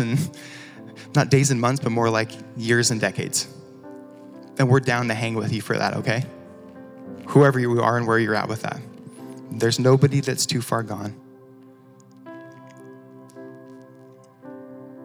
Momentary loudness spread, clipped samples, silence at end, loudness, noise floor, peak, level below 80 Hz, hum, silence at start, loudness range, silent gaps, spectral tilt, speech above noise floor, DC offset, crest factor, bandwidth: 24 LU; under 0.1%; 0 s; -21 LUFS; -49 dBFS; -2 dBFS; -70 dBFS; none; 0 s; 7 LU; none; -5 dB/octave; 28 dB; under 0.1%; 20 dB; over 20 kHz